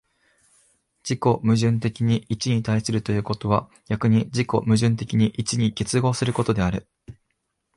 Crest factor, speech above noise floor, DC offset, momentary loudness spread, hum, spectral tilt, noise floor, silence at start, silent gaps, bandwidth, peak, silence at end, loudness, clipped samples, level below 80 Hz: 18 dB; 54 dB; under 0.1%; 5 LU; none; -6 dB/octave; -75 dBFS; 1.05 s; none; 11.5 kHz; -6 dBFS; 0.65 s; -23 LUFS; under 0.1%; -48 dBFS